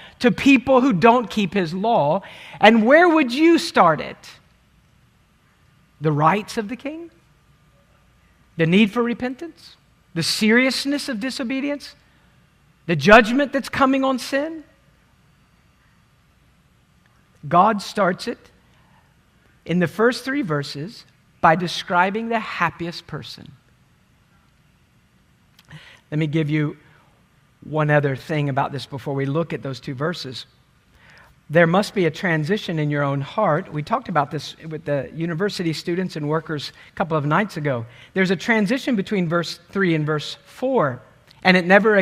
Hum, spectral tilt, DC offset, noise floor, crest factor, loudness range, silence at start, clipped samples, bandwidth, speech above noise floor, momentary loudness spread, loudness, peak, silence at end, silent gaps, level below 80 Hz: none; -6 dB/octave; under 0.1%; -58 dBFS; 22 dB; 9 LU; 0 s; under 0.1%; 15.5 kHz; 38 dB; 16 LU; -20 LUFS; 0 dBFS; 0 s; none; -54 dBFS